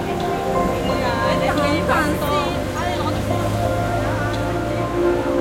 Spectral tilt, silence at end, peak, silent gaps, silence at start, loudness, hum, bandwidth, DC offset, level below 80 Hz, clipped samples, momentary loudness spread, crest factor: -6 dB/octave; 0 s; -4 dBFS; none; 0 s; -20 LUFS; none; 16.5 kHz; under 0.1%; -34 dBFS; under 0.1%; 4 LU; 16 dB